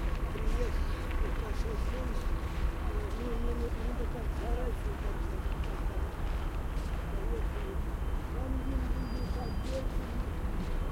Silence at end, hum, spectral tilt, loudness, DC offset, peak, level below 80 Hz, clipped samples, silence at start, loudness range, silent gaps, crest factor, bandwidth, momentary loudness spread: 0 s; none; -7 dB/octave; -37 LUFS; under 0.1%; -18 dBFS; -34 dBFS; under 0.1%; 0 s; 1 LU; none; 14 dB; 16 kHz; 2 LU